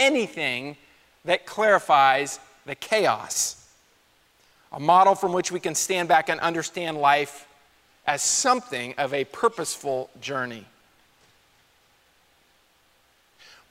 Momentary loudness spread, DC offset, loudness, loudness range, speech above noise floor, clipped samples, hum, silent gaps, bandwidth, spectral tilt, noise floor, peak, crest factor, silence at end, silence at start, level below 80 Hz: 15 LU; under 0.1%; -23 LUFS; 9 LU; 39 dB; under 0.1%; none; none; 16 kHz; -2 dB/octave; -62 dBFS; -6 dBFS; 20 dB; 3.1 s; 0 s; -70 dBFS